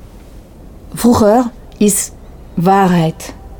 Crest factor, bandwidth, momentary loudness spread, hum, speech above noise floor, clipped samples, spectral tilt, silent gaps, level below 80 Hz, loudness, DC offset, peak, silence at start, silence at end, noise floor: 14 dB; over 20 kHz; 14 LU; none; 24 dB; under 0.1%; -5.5 dB/octave; none; -36 dBFS; -13 LUFS; under 0.1%; -2 dBFS; 0.05 s; 0.05 s; -36 dBFS